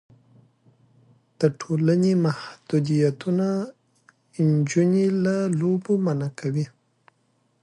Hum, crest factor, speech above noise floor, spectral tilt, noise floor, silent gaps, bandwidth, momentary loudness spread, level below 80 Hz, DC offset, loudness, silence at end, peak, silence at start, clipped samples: none; 18 dB; 45 dB; -7.5 dB/octave; -67 dBFS; none; 11 kHz; 9 LU; -68 dBFS; under 0.1%; -23 LUFS; 0.95 s; -6 dBFS; 1.4 s; under 0.1%